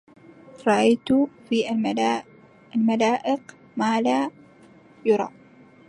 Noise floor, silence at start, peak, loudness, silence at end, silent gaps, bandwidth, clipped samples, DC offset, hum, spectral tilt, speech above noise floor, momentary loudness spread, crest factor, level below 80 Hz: -51 dBFS; 0.55 s; -6 dBFS; -23 LUFS; 0.6 s; none; 11 kHz; under 0.1%; under 0.1%; none; -5 dB/octave; 30 dB; 10 LU; 18 dB; -68 dBFS